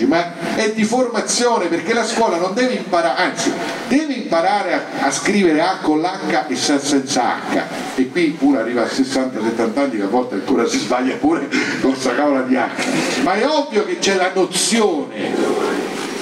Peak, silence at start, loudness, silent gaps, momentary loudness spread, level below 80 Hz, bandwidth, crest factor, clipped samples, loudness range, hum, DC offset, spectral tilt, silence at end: -4 dBFS; 0 s; -17 LUFS; none; 4 LU; -58 dBFS; 14.5 kHz; 14 dB; under 0.1%; 1 LU; none; under 0.1%; -3.5 dB/octave; 0 s